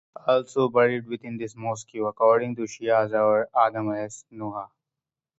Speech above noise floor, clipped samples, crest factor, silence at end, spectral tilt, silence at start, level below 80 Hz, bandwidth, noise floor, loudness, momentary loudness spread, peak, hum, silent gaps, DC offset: 65 dB; under 0.1%; 18 dB; 0.7 s; -5.5 dB/octave; 0.25 s; -70 dBFS; 8 kHz; -89 dBFS; -24 LUFS; 14 LU; -6 dBFS; none; none; under 0.1%